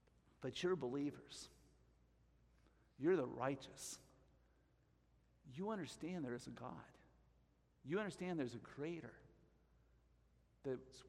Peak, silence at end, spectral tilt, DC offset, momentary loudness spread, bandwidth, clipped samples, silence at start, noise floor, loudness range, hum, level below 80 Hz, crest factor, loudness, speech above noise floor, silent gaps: -28 dBFS; 0 s; -5.5 dB/octave; under 0.1%; 16 LU; 13.5 kHz; under 0.1%; 0.4 s; -76 dBFS; 6 LU; none; -76 dBFS; 22 dB; -46 LUFS; 31 dB; none